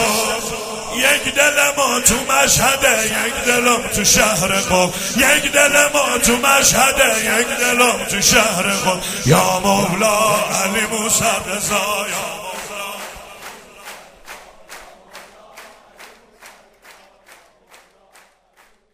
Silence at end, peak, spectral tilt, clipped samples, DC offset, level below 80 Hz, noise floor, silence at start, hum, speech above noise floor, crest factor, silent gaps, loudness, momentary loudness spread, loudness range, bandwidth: 2.05 s; 0 dBFS; -2 dB/octave; under 0.1%; under 0.1%; -42 dBFS; -54 dBFS; 0 s; none; 38 dB; 18 dB; none; -14 LUFS; 15 LU; 11 LU; 16 kHz